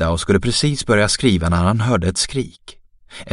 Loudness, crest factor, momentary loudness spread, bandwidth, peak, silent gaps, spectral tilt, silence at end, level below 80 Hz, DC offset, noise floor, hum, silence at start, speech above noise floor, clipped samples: -17 LUFS; 18 dB; 8 LU; 11.5 kHz; 0 dBFS; none; -4.5 dB/octave; 0 s; -34 dBFS; under 0.1%; -39 dBFS; none; 0 s; 21 dB; under 0.1%